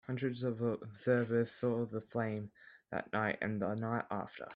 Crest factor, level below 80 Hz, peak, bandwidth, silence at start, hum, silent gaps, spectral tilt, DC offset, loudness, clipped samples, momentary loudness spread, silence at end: 18 dB; -74 dBFS; -18 dBFS; 5 kHz; 0.1 s; none; none; -10 dB/octave; under 0.1%; -37 LUFS; under 0.1%; 8 LU; 0 s